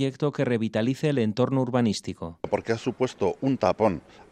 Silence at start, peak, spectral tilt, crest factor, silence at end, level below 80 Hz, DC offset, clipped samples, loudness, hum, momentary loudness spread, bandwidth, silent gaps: 0 s; -6 dBFS; -6.5 dB/octave; 18 dB; 0.1 s; -60 dBFS; under 0.1%; under 0.1%; -26 LUFS; none; 6 LU; 11 kHz; none